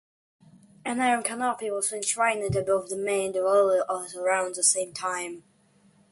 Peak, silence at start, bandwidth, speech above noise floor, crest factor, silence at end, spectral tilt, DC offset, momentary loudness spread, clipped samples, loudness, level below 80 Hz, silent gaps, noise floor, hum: -8 dBFS; 0.85 s; 12 kHz; 36 dB; 20 dB; 0.7 s; -3 dB/octave; under 0.1%; 9 LU; under 0.1%; -26 LUFS; -58 dBFS; none; -62 dBFS; none